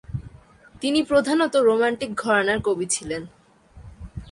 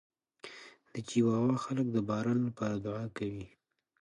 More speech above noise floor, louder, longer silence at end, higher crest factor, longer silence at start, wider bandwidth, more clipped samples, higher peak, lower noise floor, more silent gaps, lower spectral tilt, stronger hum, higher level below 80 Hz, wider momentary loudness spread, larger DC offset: first, 28 dB vs 21 dB; first, -22 LUFS vs -33 LUFS; second, 0 s vs 0.55 s; about the same, 18 dB vs 16 dB; second, 0.1 s vs 0.45 s; about the same, 11.5 kHz vs 11 kHz; neither; first, -6 dBFS vs -18 dBFS; second, -49 dBFS vs -53 dBFS; neither; second, -4 dB/octave vs -7 dB/octave; neither; first, -48 dBFS vs -66 dBFS; second, 17 LU vs 20 LU; neither